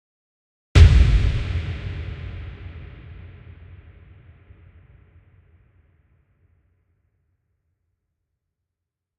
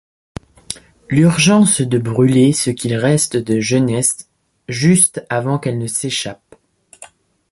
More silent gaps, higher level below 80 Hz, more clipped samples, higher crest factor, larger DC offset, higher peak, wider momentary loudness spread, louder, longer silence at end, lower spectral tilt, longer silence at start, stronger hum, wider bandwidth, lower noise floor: neither; first, -26 dBFS vs -50 dBFS; neither; first, 24 dB vs 16 dB; neither; about the same, 0 dBFS vs 0 dBFS; first, 29 LU vs 18 LU; second, -19 LUFS vs -15 LUFS; first, 6.05 s vs 0.45 s; first, -6.5 dB/octave vs -4.5 dB/octave; about the same, 0.75 s vs 0.7 s; neither; second, 9 kHz vs 12 kHz; first, -84 dBFS vs -48 dBFS